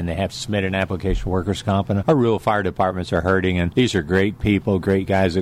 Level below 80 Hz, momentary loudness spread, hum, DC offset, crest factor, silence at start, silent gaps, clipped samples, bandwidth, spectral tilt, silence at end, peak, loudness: -36 dBFS; 5 LU; none; under 0.1%; 14 dB; 0 s; none; under 0.1%; 13.5 kHz; -6.5 dB/octave; 0 s; -6 dBFS; -20 LUFS